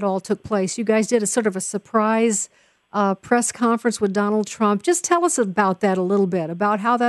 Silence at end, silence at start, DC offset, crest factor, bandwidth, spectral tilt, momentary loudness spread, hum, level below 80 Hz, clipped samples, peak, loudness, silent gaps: 0 s; 0 s; under 0.1%; 16 dB; 12 kHz; -4.5 dB/octave; 5 LU; none; -62 dBFS; under 0.1%; -4 dBFS; -20 LUFS; none